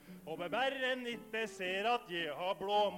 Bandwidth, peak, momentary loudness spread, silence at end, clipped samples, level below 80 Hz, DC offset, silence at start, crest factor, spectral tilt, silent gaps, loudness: 17 kHz; -22 dBFS; 6 LU; 0 s; under 0.1%; -72 dBFS; under 0.1%; 0 s; 14 dB; -3.5 dB/octave; none; -37 LUFS